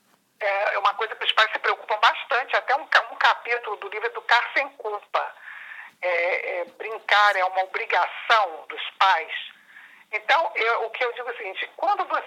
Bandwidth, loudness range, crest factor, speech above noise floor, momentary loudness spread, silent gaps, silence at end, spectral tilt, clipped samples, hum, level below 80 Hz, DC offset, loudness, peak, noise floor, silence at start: 15.5 kHz; 4 LU; 20 dB; 26 dB; 12 LU; none; 0 s; 1 dB/octave; under 0.1%; none; under -90 dBFS; under 0.1%; -23 LUFS; -4 dBFS; -49 dBFS; 0.4 s